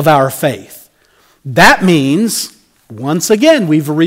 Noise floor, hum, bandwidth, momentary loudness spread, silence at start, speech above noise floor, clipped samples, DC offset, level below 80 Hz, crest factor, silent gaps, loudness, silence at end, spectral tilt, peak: -51 dBFS; none; 16.5 kHz; 17 LU; 0 s; 41 dB; 0.2%; under 0.1%; -42 dBFS; 12 dB; none; -11 LUFS; 0 s; -4.5 dB/octave; 0 dBFS